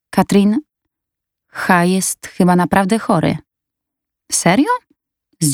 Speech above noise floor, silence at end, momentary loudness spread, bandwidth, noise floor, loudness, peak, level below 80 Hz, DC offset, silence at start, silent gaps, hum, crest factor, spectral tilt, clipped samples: 67 dB; 0 s; 9 LU; 17 kHz; -82 dBFS; -15 LUFS; 0 dBFS; -50 dBFS; under 0.1%; 0.15 s; none; none; 16 dB; -5 dB/octave; under 0.1%